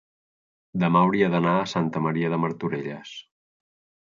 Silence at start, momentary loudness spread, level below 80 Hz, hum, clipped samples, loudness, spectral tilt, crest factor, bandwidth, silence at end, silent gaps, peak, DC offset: 0.75 s; 16 LU; -66 dBFS; none; under 0.1%; -24 LUFS; -7.5 dB/octave; 18 dB; 7.4 kHz; 0.9 s; none; -6 dBFS; under 0.1%